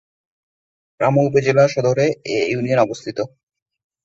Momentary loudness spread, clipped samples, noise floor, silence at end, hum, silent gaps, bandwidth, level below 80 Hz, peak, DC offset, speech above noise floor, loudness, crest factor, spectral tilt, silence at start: 11 LU; under 0.1%; under -90 dBFS; 0.8 s; none; none; 8 kHz; -58 dBFS; -2 dBFS; under 0.1%; over 73 dB; -18 LUFS; 18 dB; -6.5 dB/octave; 1 s